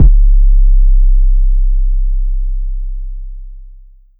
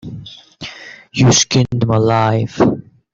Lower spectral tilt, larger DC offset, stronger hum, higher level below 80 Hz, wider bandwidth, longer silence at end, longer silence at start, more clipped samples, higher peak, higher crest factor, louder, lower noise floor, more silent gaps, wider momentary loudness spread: first, -13.5 dB/octave vs -4.5 dB/octave; neither; neither; first, -8 dBFS vs -44 dBFS; second, 0.5 kHz vs 7.8 kHz; first, 0.55 s vs 0.3 s; about the same, 0 s vs 0.05 s; first, 0.6% vs under 0.1%; about the same, 0 dBFS vs -2 dBFS; second, 8 dB vs 14 dB; about the same, -16 LUFS vs -14 LUFS; about the same, -37 dBFS vs -35 dBFS; neither; about the same, 18 LU vs 20 LU